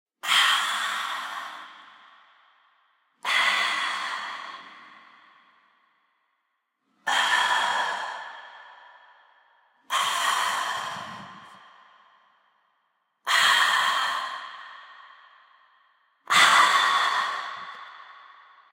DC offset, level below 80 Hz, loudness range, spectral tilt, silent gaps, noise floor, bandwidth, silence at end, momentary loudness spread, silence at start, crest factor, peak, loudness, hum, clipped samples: under 0.1%; -84 dBFS; 7 LU; 1.5 dB/octave; none; -77 dBFS; 16 kHz; 0.45 s; 24 LU; 0.25 s; 22 dB; -6 dBFS; -23 LUFS; none; under 0.1%